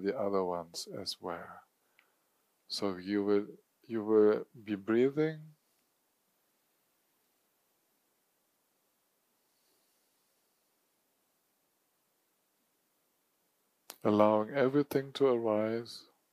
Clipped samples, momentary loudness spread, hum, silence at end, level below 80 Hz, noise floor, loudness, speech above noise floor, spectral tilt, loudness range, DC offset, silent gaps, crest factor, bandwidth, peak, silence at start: under 0.1%; 15 LU; none; 0.3 s; -84 dBFS; -77 dBFS; -32 LUFS; 46 dB; -6 dB/octave; 6 LU; under 0.1%; none; 24 dB; 15.5 kHz; -10 dBFS; 0 s